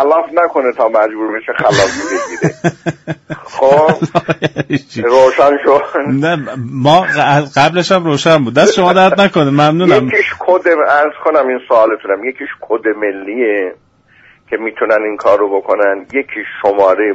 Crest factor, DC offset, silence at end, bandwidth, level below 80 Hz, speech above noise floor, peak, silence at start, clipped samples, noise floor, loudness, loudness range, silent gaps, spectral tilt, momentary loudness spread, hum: 12 dB; under 0.1%; 0 s; 8.2 kHz; -50 dBFS; 35 dB; 0 dBFS; 0 s; under 0.1%; -46 dBFS; -12 LUFS; 6 LU; none; -5.5 dB/octave; 10 LU; none